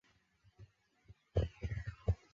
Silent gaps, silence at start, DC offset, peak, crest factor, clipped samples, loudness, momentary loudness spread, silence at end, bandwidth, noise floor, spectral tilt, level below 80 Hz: none; 0.6 s; under 0.1%; -20 dBFS; 22 dB; under 0.1%; -41 LUFS; 5 LU; 0.2 s; 7.2 kHz; -72 dBFS; -7.5 dB/octave; -48 dBFS